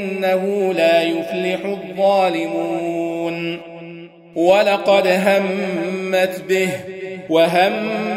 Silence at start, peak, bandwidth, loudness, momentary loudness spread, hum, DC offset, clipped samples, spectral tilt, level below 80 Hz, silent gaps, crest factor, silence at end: 0 s; -2 dBFS; 16 kHz; -18 LUFS; 14 LU; none; under 0.1%; under 0.1%; -5 dB/octave; -64 dBFS; none; 16 dB; 0 s